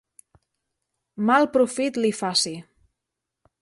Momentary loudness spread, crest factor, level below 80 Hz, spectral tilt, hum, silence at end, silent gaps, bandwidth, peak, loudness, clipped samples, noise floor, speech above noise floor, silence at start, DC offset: 9 LU; 20 dB; -68 dBFS; -3.5 dB/octave; none; 1 s; none; 11.5 kHz; -6 dBFS; -22 LUFS; under 0.1%; -84 dBFS; 62 dB; 1.15 s; under 0.1%